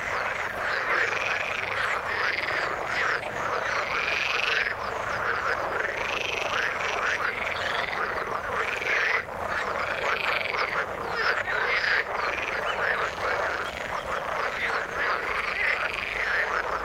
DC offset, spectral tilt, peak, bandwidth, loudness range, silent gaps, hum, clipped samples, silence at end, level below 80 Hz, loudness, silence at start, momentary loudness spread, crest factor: under 0.1%; -2.5 dB/octave; -8 dBFS; 16.5 kHz; 1 LU; none; none; under 0.1%; 0 s; -52 dBFS; -26 LUFS; 0 s; 5 LU; 18 dB